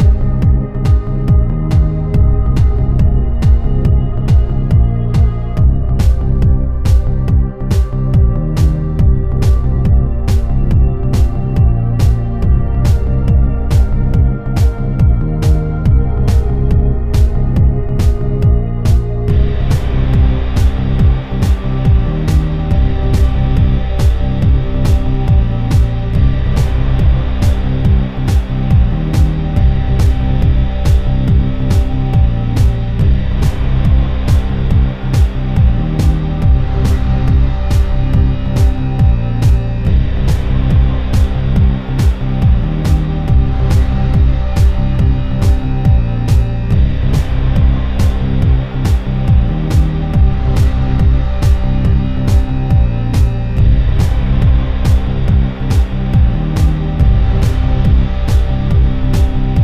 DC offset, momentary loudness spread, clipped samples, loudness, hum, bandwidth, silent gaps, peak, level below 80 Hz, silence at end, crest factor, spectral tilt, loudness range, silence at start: under 0.1%; 2 LU; under 0.1%; -14 LUFS; none; 10.5 kHz; none; -2 dBFS; -14 dBFS; 0 s; 10 dB; -8 dB/octave; 1 LU; 0 s